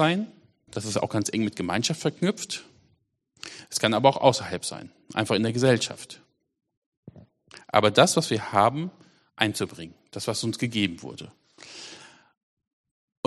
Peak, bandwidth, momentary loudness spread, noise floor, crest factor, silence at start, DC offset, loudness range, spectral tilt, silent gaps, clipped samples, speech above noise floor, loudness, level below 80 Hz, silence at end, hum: -2 dBFS; 13 kHz; 21 LU; -70 dBFS; 26 dB; 0 s; under 0.1%; 6 LU; -4 dB/octave; 6.77-7.03 s; under 0.1%; 45 dB; -25 LUFS; -66 dBFS; 1.2 s; none